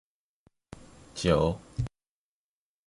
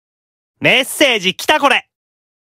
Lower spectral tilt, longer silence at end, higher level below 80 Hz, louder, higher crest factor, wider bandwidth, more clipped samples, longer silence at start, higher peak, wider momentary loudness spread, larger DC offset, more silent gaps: first, -6 dB/octave vs -2.5 dB/octave; first, 1 s vs 0.7 s; first, -46 dBFS vs -60 dBFS; second, -29 LUFS vs -13 LUFS; first, 24 dB vs 16 dB; second, 11.5 kHz vs 16 kHz; neither; first, 0.75 s vs 0.6 s; second, -10 dBFS vs 0 dBFS; first, 25 LU vs 4 LU; neither; neither